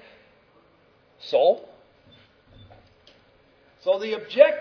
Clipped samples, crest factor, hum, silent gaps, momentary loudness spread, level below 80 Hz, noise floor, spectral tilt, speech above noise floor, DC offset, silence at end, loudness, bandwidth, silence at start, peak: under 0.1%; 24 dB; none; none; 13 LU; -68 dBFS; -59 dBFS; -4.5 dB/octave; 39 dB; under 0.1%; 0 s; -23 LUFS; 5.4 kHz; 1.25 s; -2 dBFS